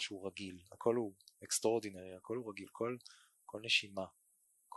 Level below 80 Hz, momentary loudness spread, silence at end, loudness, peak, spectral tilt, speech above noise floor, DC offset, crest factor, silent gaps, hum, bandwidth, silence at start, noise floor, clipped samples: -76 dBFS; 17 LU; 0 s; -39 LUFS; -18 dBFS; -2.5 dB/octave; 34 dB; under 0.1%; 22 dB; none; none; 12 kHz; 0 s; -75 dBFS; under 0.1%